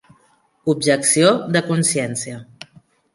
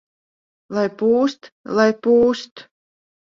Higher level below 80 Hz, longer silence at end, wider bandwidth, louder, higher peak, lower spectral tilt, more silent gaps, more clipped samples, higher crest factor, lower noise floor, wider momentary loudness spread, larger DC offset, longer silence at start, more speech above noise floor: about the same, -62 dBFS vs -60 dBFS; about the same, 0.7 s vs 0.65 s; first, 11.5 kHz vs 7.4 kHz; about the same, -17 LUFS vs -19 LUFS; about the same, -2 dBFS vs -2 dBFS; second, -4 dB/octave vs -5.5 dB/octave; second, none vs 1.52-1.64 s, 2.51-2.56 s; neither; about the same, 18 dB vs 18 dB; second, -59 dBFS vs under -90 dBFS; about the same, 13 LU vs 12 LU; neither; about the same, 0.65 s vs 0.7 s; second, 41 dB vs over 72 dB